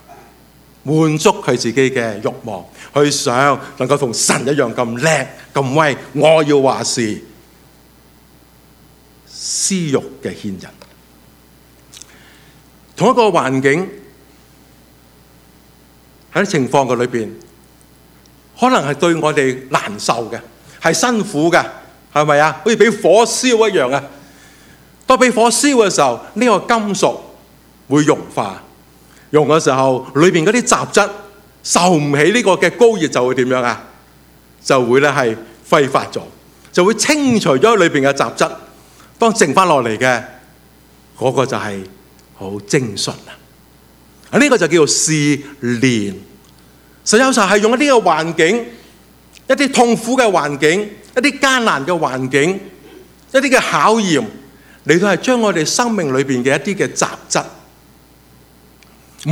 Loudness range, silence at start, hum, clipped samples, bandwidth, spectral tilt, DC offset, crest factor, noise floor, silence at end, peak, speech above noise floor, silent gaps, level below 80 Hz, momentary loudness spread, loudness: 8 LU; 0.1 s; none; under 0.1%; 17.5 kHz; -4 dB/octave; under 0.1%; 16 dB; -46 dBFS; 0 s; 0 dBFS; 33 dB; none; -54 dBFS; 14 LU; -14 LUFS